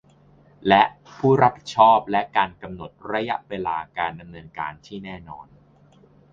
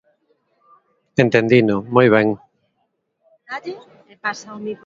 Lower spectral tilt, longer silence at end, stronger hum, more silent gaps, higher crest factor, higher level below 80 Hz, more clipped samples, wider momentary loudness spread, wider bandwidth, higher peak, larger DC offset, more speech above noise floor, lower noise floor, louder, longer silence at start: about the same, -6 dB/octave vs -7 dB/octave; first, 0.9 s vs 0.1 s; neither; neither; about the same, 22 dB vs 20 dB; about the same, -56 dBFS vs -58 dBFS; neither; about the same, 20 LU vs 18 LU; about the same, 7.6 kHz vs 7.6 kHz; about the same, 0 dBFS vs 0 dBFS; neither; second, 32 dB vs 54 dB; second, -54 dBFS vs -70 dBFS; second, -21 LUFS vs -17 LUFS; second, 0.65 s vs 1.2 s